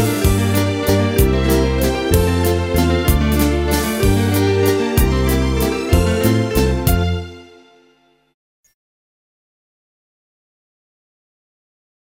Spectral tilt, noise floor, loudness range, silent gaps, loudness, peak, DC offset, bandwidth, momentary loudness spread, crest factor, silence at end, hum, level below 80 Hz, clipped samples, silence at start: -6 dB/octave; -56 dBFS; 7 LU; none; -16 LUFS; 0 dBFS; under 0.1%; 16.5 kHz; 3 LU; 18 dB; 4.6 s; none; -24 dBFS; under 0.1%; 0 s